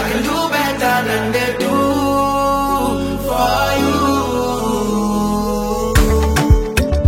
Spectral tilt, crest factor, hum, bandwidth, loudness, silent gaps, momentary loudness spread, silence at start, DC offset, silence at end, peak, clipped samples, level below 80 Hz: -5.5 dB/octave; 14 dB; none; 16.5 kHz; -16 LUFS; none; 4 LU; 0 s; under 0.1%; 0 s; 0 dBFS; under 0.1%; -24 dBFS